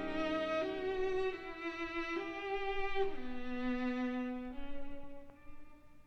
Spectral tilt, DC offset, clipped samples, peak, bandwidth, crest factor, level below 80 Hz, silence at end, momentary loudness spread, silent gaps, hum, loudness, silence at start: -5.5 dB/octave; under 0.1%; under 0.1%; -22 dBFS; 6.6 kHz; 16 dB; -52 dBFS; 0 s; 14 LU; none; none; -39 LUFS; 0 s